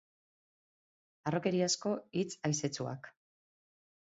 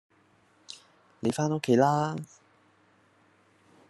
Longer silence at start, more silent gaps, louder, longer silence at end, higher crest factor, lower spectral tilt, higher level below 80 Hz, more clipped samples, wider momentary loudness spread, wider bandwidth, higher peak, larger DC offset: first, 1.25 s vs 0.7 s; neither; second, -35 LUFS vs -27 LUFS; second, 0.95 s vs 1.65 s; about the same, 20 dB vs 22 dB; second, -5 dB/octave vs -6.5 dB/octave; about the same, -76 dBFS vs -74 dBFS; neither; second, 11 LU vs 24 LU; second, 7.6 kHz vs 12.5 kHz; second, -18 dBFS vs -8 dBFS; neither